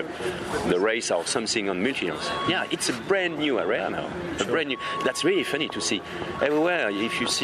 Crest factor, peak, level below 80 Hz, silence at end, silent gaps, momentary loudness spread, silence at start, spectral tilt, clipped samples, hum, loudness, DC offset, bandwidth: 16 dB; -8 dBFS; -56 dBFS; 0 s; none; 6 LU; 0 s; -3 dB/octave; under 0.1%; none; -25 LUFS; under 0.1%; 13.5 kHz